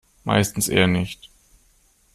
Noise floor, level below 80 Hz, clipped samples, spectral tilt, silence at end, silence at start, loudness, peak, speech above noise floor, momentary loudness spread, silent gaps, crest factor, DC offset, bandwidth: -59 dBFS; -50 dBFS; under 0.1%; -4.5 dB/octave; 0.9 s; 0.25 s; -21 LUFS; -4 dBFS; 39 dB; 12 LU; none; 20 dB; under 0.1%; 14.5 kHz